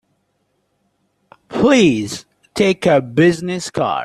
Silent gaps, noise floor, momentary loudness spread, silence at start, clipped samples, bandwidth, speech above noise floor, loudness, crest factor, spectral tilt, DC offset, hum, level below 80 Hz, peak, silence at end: none; -67 dBFS; 15 LU; 1.5 s; under 0.1%; 13 kHz; 52 dB; -16 LUFS; 16 dB; -5.5 dB/octave; under 0.1%; none; -52 dBFS; -2 dBFS; 0 s